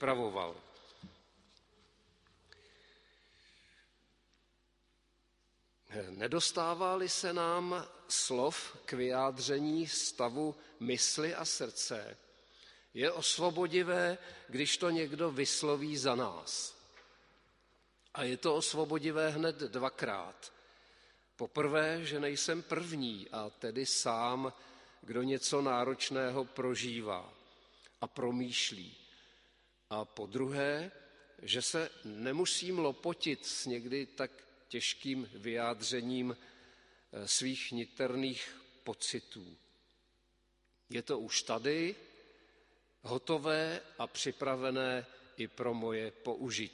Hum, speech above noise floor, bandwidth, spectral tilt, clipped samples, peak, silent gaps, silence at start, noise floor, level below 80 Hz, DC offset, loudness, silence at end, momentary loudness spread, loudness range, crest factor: none; 39 dB; 11.5 kHz; -3 dB/octave; under 0.1%; -16 dBFS; none; 0 s; -75 dBFS; -76 dBFS; under 0.1%; -36 LUFS; 0 s; 13 LU; 5 LU; 22 dB